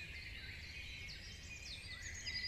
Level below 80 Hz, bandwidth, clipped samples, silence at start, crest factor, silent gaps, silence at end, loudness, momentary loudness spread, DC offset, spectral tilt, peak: -56 dBFS; 13 kHz; under 0.1%; 0 s; 16 dB; none; 0 s; -48 LUFS; 4 LU; under 0.1%; -1.5 dB/octave; -32 dBFS